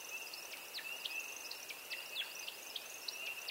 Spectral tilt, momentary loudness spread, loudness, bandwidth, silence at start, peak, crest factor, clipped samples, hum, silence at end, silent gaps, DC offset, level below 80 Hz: 1.5 dB/octave; 4 LU; -43 LUFS; 16 kHz; 0 s; -28 dBFS; 18 dB; under 0.1%; none; 0 s; none; under 0.1%; -88 dBFS